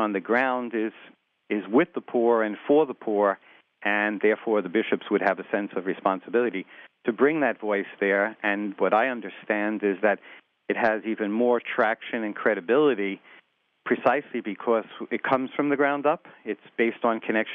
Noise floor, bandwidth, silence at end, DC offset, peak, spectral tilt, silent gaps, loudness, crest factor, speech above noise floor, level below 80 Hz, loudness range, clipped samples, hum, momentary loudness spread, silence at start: -60 dBFS; 5.4 kHz; 0 s; under 0.1%; -6 dBFS; -8 dB/octave; none; -25 LUFS; 20 dB; 35 dB; -78 dBFS; 2 LU; under 0.1%; none; 9 LU; 0 s